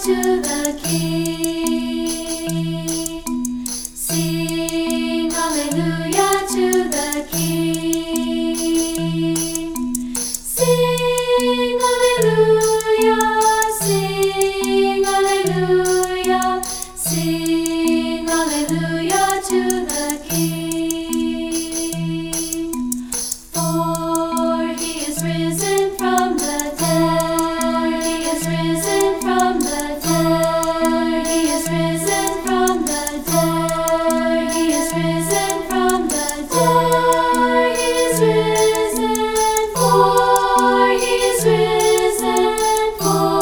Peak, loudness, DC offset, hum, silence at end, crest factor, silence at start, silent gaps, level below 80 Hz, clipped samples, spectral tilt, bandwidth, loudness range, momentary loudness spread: -2 dBFS; -18 LUFS; under 0.1%; none; 0 s; 16 dB; 0 s; none; -40 dBFS; under 0.1%; -4 dB/octave; over 20 kHz; 6 LU; 7 LU